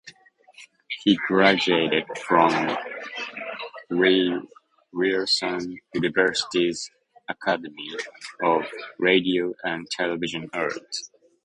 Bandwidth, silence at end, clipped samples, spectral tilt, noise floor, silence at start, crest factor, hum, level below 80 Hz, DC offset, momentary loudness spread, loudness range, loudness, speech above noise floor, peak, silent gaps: 10.5 kHz; 0.4 s; under 0.1%; -4 dB/octave; -53 dBFS; 0.05 s; 22 dB; none; -66 dBFS; under 0.1%; 15 LU; 3 LU; -24 LUFS; 30 dB; -2 dBFS; none